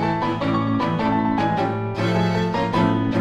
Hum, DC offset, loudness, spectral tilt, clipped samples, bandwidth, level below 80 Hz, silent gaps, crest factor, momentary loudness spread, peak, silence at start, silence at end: none; under 0.1%; -21 LUFS; -7.5 dB/octave; under 0.1%; 9.8 kHz; -44 dBFS; none; 14 dB; 3 LU; -8 dBFS; 0 s; 0 s